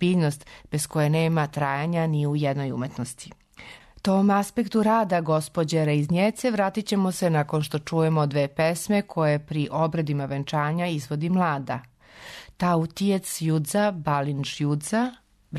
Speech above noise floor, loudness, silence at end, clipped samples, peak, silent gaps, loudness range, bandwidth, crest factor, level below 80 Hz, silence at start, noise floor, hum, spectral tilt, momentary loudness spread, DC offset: 23 dB; -25 LUFS; 0 s; under 0.1%; -12 dBFS; none; 3 LU; 13.5 kHz; 12 dB; -58 dBFS; 0 s; -47 dBFS; none; -6 dB/octave; 10 LU; under 0.1%